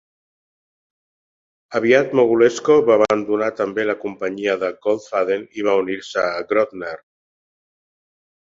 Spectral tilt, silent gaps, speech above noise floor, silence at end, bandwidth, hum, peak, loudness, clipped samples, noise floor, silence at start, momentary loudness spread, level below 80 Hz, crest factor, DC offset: -5 dB/octave; none; over 72 dB; 1.5 s; 7.8 kHz; none; 0 dBFS; -19 LUFS; under 0.1%; under -90 dBFS; 1.7 s; 10 LU; -62 dBFS; 20 dB; under 0.1%